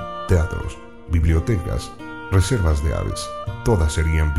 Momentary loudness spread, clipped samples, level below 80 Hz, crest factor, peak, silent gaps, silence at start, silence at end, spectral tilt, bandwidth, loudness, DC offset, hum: 11 LU; under 0.1%; -26 dBFS; 18 dB; -2 dBFS; none; 0 s; 0 s; -6.5 dB/octave; 13 kHz; -21 LUFS; 0.8%; none